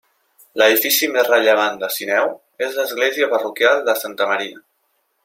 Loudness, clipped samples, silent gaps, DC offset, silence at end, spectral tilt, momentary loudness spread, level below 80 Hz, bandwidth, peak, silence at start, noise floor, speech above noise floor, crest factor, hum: -17 LUFS; under 0.1%; none; under 0.1%; 0.65 s; -1 dB/octave; 10 LU; -70 dBFS; 16.5 kHz; -2 dBFS; 0.55 s; -67 dBFS; 50 dB; 18 dB; none